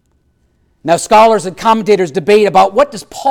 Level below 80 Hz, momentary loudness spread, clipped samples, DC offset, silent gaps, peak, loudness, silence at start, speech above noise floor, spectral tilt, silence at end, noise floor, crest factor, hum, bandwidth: -48 dBFS; 8 LU; under 0.1%; under 0.1%; none; 0 dBFS; -11 LUFS; 0.85 s; 47 dB; -4.5 dB/octave; 0 s; -57 dBFS; 10 dB; none; 16 kHz